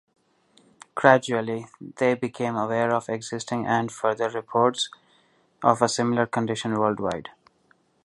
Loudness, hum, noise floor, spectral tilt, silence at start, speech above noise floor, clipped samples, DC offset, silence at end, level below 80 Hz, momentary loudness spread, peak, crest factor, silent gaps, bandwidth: -24 LUFS; none; -64 dBFS; -5 dB/octave; 0.95 s; 40 dB; under 0.1%; under 0.1%; 0.75 s; -64 dBFS; 10 LU; 0 dBFS; 24 dB; none; 11.5 kHz